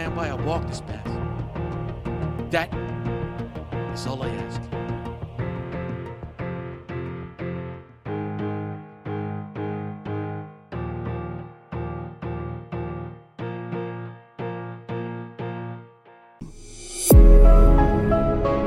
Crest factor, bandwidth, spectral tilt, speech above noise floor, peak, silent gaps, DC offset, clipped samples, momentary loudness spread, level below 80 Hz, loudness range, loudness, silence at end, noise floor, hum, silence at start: 20 dB; 16 kHz; -6.5 dB/octave; 24 dB; -2 dBFS; none; under 0.1%; under 0.1%; 16 LU; -24 dBFS; 13 LU; -26 LUFS; 0 s; -51 dBFS; none; 0 s